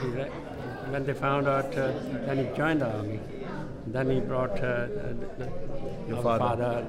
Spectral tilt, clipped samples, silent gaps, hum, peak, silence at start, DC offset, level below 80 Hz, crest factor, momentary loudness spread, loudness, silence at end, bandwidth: -7.5 dB/octave; under 0.1%; none; none; -12 dBFS; 0 s; under 0.1%; -44 dBFS; 16 dB; 11 LU; -30 LUFS; 0 s; 12.5 kHz